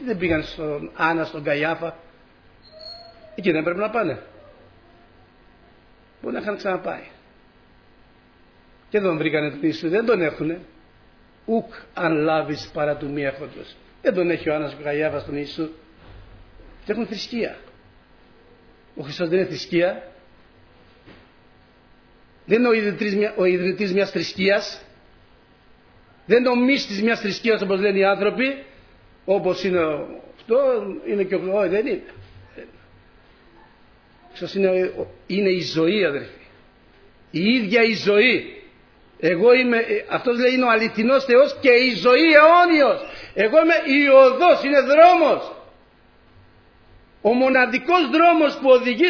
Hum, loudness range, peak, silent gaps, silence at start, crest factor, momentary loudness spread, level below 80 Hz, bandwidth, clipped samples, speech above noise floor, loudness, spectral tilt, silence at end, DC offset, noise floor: none; 13 LU; 0 dBFS; none; 0 s; 20 dB; 16 LU; -56 dBFS; 5.4 kHz; under 0.1%; 34 dB; -19 LUFS; -6 dB/octave; 0 s; under 0.1%; -53 dBFS